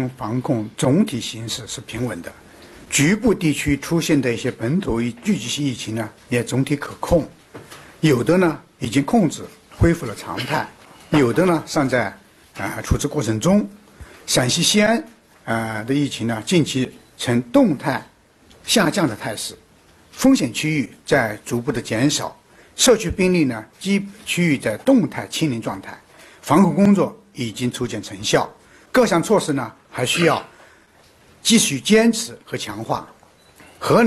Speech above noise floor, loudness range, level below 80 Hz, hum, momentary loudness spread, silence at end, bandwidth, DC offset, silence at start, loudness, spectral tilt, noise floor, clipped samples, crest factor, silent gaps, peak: 33 dB; 2 LU; -42 dBFS; none; 13 LU; 0 s; 13 kHz; under 0.1%; 0 s; -20 LUFS; -4.5 dB/octave; -52 dBFS; under 0.1%; 20 dB; none; 0 dBFS